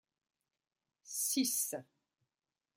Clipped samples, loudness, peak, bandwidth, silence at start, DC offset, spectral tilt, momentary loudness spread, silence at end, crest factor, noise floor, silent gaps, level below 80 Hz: under 0.1%; -35 LUFS; -22 dBFS; 16 kHz; 1.05 s; under 0.1%; -1 dB/octave; 11 LU; 0.95 s; 20 dB; under -90 dBFS; none; under -90 dBFS